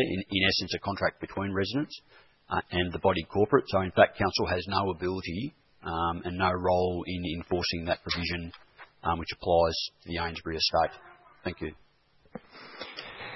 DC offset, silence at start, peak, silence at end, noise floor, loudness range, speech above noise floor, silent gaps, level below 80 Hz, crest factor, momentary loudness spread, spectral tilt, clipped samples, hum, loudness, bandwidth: under 0.1%; 0 s; -4 dBFS; 0 s; -64 dBFS; 3 LU; 35 dB; none; -56 dBFS; 26 dB; 15 LU; -5.5 dB/octave; under 0.1%; none; -29 LUFS; 6 kHz